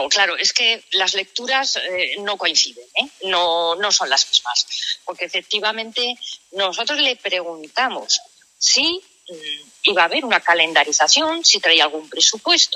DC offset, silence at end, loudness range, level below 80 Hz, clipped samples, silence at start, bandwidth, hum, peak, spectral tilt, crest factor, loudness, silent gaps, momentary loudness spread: under 0.1%; 0 s; 5 LU; -70 dBFS; under 0.1%; 0 s; 14.5 kHz; none; 0 dBFS; 1 dB/octave; 20 dB; -17 LUFS; none; 10 LU